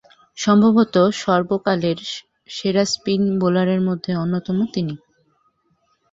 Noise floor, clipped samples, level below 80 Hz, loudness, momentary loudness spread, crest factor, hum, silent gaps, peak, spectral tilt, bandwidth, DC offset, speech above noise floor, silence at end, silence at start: -65 dBFS; under 0.1%; -58 dBFS; -19 LUFS; 12 LU; 18 dB; none; none; -2 dBFS; -6 dB/octave; 8 kHz; under 0.1%; 47 dB; 1.15 s; 0.35 s